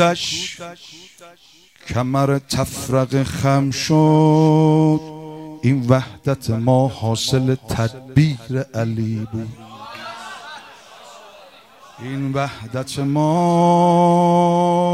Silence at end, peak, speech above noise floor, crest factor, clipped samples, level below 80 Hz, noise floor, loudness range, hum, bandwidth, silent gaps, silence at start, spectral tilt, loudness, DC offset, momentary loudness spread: 0 s; -2 dBFS; 28 dB; 18 dB; under 0.1%; -50 dBFS; -45 dBFS; 12 LU; none; 15.5 kHz; none; 0 s; -6.5 dB/octave; -18 LUFS; under 0.1%; 20 LU